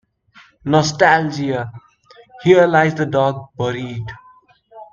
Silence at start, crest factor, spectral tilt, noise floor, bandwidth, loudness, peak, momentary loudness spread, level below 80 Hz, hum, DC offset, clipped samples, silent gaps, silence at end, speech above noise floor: 0.65 s; 18 dB; -5.5 dB/octave; -50 dBFS; 7.4 kHz; -16 LUFS; 0 dBFS; 17 LU; -54 dBFS; none; under 0.1%; under 0.1%; none; 0.1 s; 34 dB